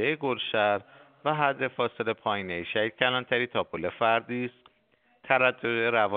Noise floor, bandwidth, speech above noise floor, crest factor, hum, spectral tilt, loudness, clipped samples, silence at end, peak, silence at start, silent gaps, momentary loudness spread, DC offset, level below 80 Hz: -67 dBFS; 4.7 kHz; 40 dB; 22 dB; none; -2 dB/octave; -27 LUFS; under 0.1%; 0 s; -6 dBFS; 0 s; none; 8 LU; under 0.1%; -70 dBFS